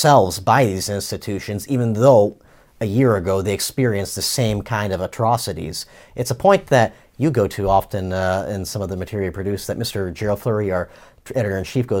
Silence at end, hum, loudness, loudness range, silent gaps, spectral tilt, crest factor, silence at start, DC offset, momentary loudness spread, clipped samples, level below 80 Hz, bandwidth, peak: 0 s; none; -20 LUFS; 5 LU; none; -5.5 dB/octave; 18 dB; 0 s; under 0.1%; 11 LU; under 0.1%; -44 dBFS; 17 kHz; -2 dBFS